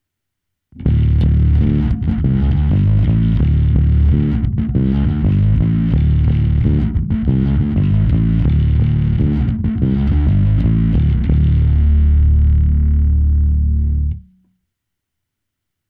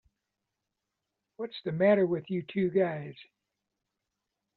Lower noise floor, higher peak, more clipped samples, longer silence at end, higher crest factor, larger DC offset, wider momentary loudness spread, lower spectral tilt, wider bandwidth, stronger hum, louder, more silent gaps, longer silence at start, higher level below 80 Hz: second, -78 dBFS vs -86 dBFS; first, 0 dBFS vs -14 dBFS; neither; first, 1.7 s vs 1.35 s; second, 14 dB vs 20 dB; neither; second, 4 LU vs 16 LU; first, -11.5 dB/octave vs -6 dB/octave; second, 3.8 kHz vs 4.5 kHz; neither; first, -15 LUFS vs -29 LUFS; neither; second, 0.75 s vs 1.4 s; first, -16 dBFS vs -74 dBFS